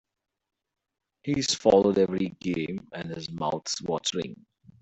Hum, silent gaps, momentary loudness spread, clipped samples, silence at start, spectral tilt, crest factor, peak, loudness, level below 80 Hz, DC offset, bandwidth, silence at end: none; none; 15 LU; under 0.1%; 1.25 s; -4.5 dB/octave; 24 dB; -6 dBFS; -27 LUFS; -60 dBFS; under 0.1%; 8.4 kHz; 0.45 s